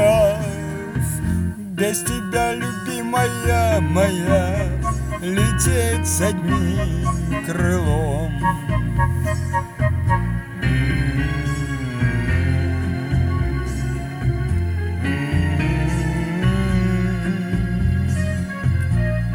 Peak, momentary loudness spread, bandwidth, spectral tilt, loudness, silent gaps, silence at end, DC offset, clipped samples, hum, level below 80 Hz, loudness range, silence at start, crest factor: -4 dBFS; 6 LU; 20 kHz; -6 dB/octave; -21 LUFS; none; 0 s; under 0.1%; under 0.1%; none; -28 dBFS; 3 LU; 0 s; 14 dB